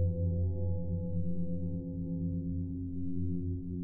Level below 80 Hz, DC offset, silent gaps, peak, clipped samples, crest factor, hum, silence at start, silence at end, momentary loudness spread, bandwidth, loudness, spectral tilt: -48 dBFS; under 0.1%; none; -22 dBFS; under 0.1%; 10 dB; none; 0 s; 0 s; 5 LU; 0.9 kHz; -36 LUFS; -14.5 dB/octave